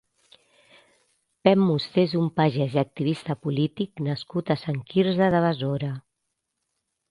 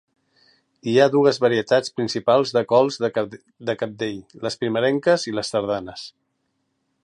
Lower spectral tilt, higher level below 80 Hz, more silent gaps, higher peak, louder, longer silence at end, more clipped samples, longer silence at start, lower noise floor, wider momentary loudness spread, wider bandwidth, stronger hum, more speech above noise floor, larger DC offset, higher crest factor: first, -8.5 dB/octave vs -5 dB/octave; about the same, -62 dBFS vs -64 dBFS; neither; about the same, -2 dBFS vs -2 dBFS; second, -24 LUFS vs -21 LUFS; first, 1.1 s vs 0.95 s; neither; first, 1.45 s vs 0.85 s; first, -80 dBFS vs -72 dBFS; second, 9 LU vs 14 LU; about the same, 11 kHz vs 11 kHz; neither; first, 57 dB vs 52 dB; neither; about the same, 22 dB vs 20 dB